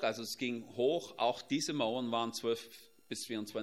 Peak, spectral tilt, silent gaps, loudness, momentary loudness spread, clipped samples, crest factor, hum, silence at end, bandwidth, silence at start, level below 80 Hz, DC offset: -18 dBFS; -3.5 dB/octave; none; -36 LUFS; 9 LU; under 0.1%; 20 dB; none; 0 s; 16 kHz; 0 s; -82 dBFS; under 0.1%